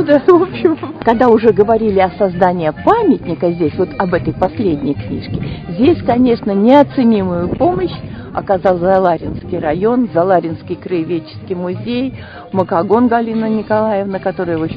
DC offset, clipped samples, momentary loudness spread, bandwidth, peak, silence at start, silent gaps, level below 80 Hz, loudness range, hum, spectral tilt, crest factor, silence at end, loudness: under 0.1%; 0.2%; 12 LU; 5.6 kHz; 0 dBFS; 0 s; none; -38 dBFS; 4 LU; none; -9.5 dB/octave; 14 dB; 0 s; -14 LUFS